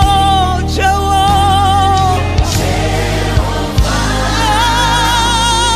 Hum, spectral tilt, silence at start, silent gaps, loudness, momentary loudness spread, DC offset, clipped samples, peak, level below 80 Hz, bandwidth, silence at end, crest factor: none; -4 dB/octave; 0 s; none; -12 LUFS; 4 LU; under 0.1%; under 0.1%; 0 dBFS; -18 dBFS; 15.5 kHz; 0 s; 12 dB